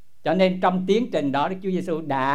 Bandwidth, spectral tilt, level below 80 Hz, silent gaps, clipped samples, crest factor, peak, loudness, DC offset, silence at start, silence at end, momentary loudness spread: 10 kHz; -7 dB/octave; -62 dBFS; none; under 0.1%; 16 dB; -6 dBFS; -23 LUFS; 1%; 0.25 s; 0 s; 6 LU